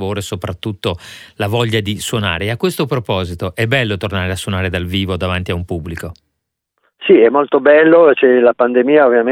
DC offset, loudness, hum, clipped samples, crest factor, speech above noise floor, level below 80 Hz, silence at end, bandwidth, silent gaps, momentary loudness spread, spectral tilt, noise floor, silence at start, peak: under 0.1%; -14 LUFS; none; under 0.1%; 14 dB; 60 dB; -42 dBFS; 0 s; 16.5 kHz; none; 14 LU; -6 dB/octave; -74 dBFS; 0 s; 0 dBFS